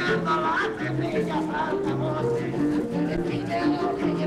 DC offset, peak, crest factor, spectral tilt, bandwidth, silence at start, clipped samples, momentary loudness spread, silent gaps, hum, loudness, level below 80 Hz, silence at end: under 0.1%; -14 dBFS; 12 dB; -7 dB/octave; 12 kHz; 0 s; under 0.1%; 3 LU; none; none; -26 LUFS; -50 dBFS; 0 s